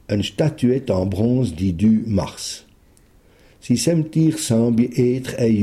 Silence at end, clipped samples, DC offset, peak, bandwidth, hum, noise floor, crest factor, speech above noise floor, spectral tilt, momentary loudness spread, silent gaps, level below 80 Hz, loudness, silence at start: 0 s; under 0.1%; under 0.1%; -6 dBFS; 15 kHz; none; -52 dBFS; 14 dB; 34 dB; -6.5 dB/octave; 6 LU; none; -46 dBFS; -19 LUFS; 0.1 s